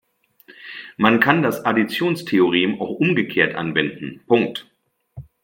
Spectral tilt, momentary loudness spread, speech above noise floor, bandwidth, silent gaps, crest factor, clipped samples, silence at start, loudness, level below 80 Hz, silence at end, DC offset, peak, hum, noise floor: -6 dB/octave; 18 LU; 33 dB; 16.5 kHz; none; 20 dB; under 0.1%; 0.5 s; -19 LUFS; -60 dBFS; 0.2 s; under 0.1%; 0 dBFS; none; -52 dBFS